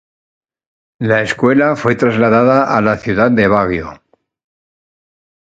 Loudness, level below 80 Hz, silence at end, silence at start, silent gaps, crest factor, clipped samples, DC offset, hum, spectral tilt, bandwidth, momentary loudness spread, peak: -13 LUFS; -44 dBFS; 1.55 s; 1 s; none; 14 dB; under 0.1%; under 0.1%; none; -7 dB/octave; 9 kHz; 7 LU; 0 dBFS